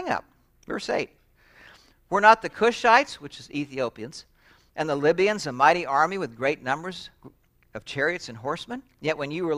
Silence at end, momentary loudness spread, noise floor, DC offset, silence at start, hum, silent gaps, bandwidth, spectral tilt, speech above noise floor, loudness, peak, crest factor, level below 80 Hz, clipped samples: 0 s; 20 LU; -55 dBFS; under 0.1%; 0 s; none; none; 14.5 kHz; -4.5 dB/octave; 31 dB; -24 LUFS; -2 dBFS; 24 dB; -60 dBFS; under 0.1%